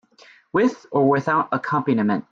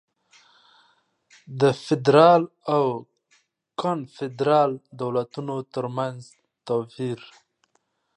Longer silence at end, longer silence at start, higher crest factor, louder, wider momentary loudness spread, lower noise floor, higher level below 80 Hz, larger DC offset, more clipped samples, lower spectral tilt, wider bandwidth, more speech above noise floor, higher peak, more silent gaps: second, 0.1 s vs 1 s; second, 0.55 s vs 1.5 s; second, 16 dB vs 22 dB; about the same, -21 LUFS vs -23 LUFS; second, 4 LU vs 17 LU; second, -52 dBFS vs -71 dBFS; first, -64 dBFS vs -74 dBFS; neither; neither; about the same, -7.5 dB/octave vs -7 dB/octave; second, 7.4 kHz vs 10.5 kHz; second, 32 dB vs 48 dB; second, -6 dBFS vs -2 dBFS; neither